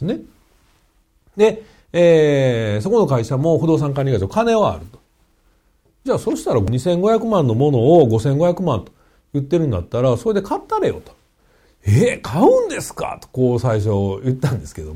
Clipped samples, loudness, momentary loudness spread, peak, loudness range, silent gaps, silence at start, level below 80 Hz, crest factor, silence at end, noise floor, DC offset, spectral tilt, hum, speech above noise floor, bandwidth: under 0.1%; -17 LUFS; 12 LU; -2 dBFS; 4 LU; none; 0 s; -44 dBFS; 16 dB; 0 s; -59 dBFS; under 0.1%; -7.5 dB/octave; none; 42 dB; 15.5 kHz